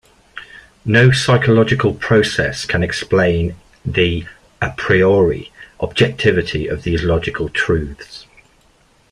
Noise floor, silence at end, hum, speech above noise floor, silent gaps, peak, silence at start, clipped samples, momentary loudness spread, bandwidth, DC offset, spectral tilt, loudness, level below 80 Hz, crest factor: -54 dBFS; 0.9 s; none; 39 dB; none; -2 dBFS; 0.35 s; under 0.1%; 22 LU; 11.5 kHz; under 0.1%; -6 dB/octave; -16 LUFS; -38 dBFS; 16 dB